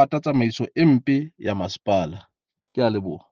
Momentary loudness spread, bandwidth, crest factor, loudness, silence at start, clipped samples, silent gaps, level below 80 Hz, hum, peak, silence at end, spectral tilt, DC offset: 11 LU; 7.2 kHz; 18 dB; -22 LUFS; 0 s; under 0.1%; none; -62 dBFS; none; -4 dBFS; 0.15 s; -7.5 dB/octave; under 0.1%